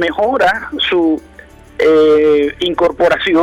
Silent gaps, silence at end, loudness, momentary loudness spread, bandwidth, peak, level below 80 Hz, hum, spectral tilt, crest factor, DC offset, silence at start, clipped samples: none; 0 s; -13 LUFS; 7 LU; 11.5 kHz; -4 dBFS; -42 dBFS; none; -5 dB/octave; 8 dB; under 0.1%; 0 s; under 0.1%